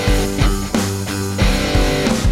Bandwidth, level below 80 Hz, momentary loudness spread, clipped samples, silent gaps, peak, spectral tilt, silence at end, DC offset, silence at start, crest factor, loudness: 16.5 kHz; -20 dBFS; 5 LU; under 0.1%; none; -2 dBFS; -5 dB/octave; 0 s; under 0.1%; 0 s; 14 dB; -18 LUFS